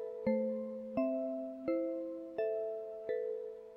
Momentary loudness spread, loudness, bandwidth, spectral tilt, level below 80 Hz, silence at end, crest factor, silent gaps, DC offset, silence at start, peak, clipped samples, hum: 6 LU; -38 LUFS; 5.6 kHz; -9 dB/octave; -74 dBFS; 0 s; 16 dB; none; under 0.1%; 0 s; -22 dBFS; under 0.1%; none